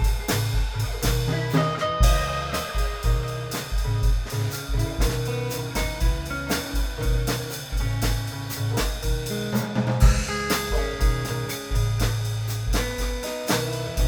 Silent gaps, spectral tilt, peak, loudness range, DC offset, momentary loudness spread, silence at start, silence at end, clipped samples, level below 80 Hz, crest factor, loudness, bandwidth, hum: none; -4.5 dB/octave; -6 dBFS; 2 LU; under 0.1%; 7 LU; 0 s; 0 s; under 0.1%; -26 dBFS; 18 dB; -25 LUFS; over 20 kHz; none